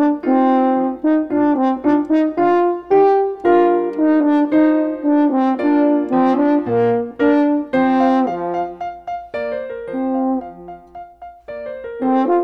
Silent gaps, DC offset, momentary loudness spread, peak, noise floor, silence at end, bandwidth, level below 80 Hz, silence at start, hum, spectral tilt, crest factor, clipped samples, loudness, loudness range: none; under 0.1%; 13 LU; -2 dBFS; -37 dBFS; 0 s; 5.2 kHz; -54 dBFS; 0 s; none; -8.5 dB/octave; 14 dB; under 0.1%; -16 LUFS; 8 LU